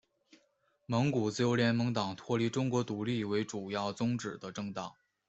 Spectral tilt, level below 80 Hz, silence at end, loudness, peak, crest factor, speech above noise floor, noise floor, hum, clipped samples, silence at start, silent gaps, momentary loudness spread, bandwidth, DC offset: -6 dB/octave; -70 dBFS; 0.35 s; -33 LUFS; -16 dBFS; 18 dB; 41 dB; -74 dBFS; none; under 0.1%; 0.9 s; none; 11 LU; 8.2 kHz; under 0.1%